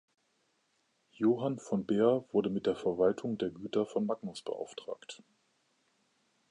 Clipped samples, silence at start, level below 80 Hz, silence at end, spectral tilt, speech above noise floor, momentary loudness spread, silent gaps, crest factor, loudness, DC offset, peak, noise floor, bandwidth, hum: under 0.1%; 1.2 s; -72 dBFS; 1.35 s; -7 dB/octave; 44 dB; 15 LU; none; 20 dB; -33 LUFS; under 0.1%; -14 dBFS; -76 dBFS; 11 kHz; none